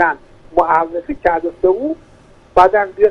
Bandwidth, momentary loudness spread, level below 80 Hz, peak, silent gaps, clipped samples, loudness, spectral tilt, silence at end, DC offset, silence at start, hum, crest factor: 9 kHz; 11 LU; -40 dBFS; 0 dBFS; none; under 0.1%; -15 LUFS; -6.5 dB/octave; 0 s; under 0.1%; 0 s; none; 16 dB